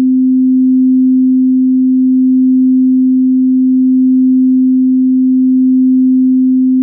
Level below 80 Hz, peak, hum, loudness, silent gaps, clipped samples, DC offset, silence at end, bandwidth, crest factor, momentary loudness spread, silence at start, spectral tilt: -72 dBFS; -4 dBFS; none; -9 LUFS; none; under 0.1%; under 0.1%; 0 s; 0.4 kHz; 4 dB; 1 LU; 0 s; -17.5 dB/octave